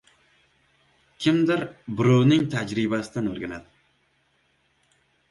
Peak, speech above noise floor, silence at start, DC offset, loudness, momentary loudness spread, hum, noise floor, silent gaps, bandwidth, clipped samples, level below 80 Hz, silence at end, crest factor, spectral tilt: -6 dBFS; 45 dB; 1.2 s; under 0.1%; -23 LUFS; 15 LU; none; -67 dBFS; none; 11.5 kHz; under 0.1%; -60 dBFS; 1.7 s; 18 dB; -7 dB/octave